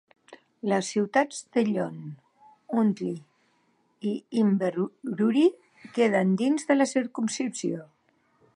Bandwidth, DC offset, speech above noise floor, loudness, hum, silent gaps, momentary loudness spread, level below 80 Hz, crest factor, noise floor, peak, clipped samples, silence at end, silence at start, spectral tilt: 11 kHz; under 0.1%; 43 dB; -26 LUFS; none; none; 11 LU; -80 dBFS; 18 dB; -68 dBFS; -8 dBFS; under 0.1%; 0.7 s; 0.3 s; -5.5 dB/octave